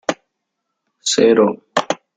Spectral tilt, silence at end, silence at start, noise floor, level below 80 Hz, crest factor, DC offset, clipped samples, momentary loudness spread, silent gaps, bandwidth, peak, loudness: -3.5 dB/octave; 0.2 s; 0.1 s; -76 dBFS; -62 dBFS; 18 dB; under 0.1%; under 0.1%; 12 LU; none; 9.6 kHz; 0 dBFS; -16 LUFS